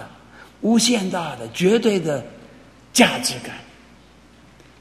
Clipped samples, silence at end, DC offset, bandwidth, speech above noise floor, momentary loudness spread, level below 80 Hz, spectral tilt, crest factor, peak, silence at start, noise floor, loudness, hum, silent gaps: under 0.1%; 1.15 s; under 0.1%; 15.5 kHz; 30 dB; 19 LU; -56 dBFS; -3.5 dB/octave; 22 dB; 0 dBFS; 0 s; -49 dBFS; -19 LUFS; none; none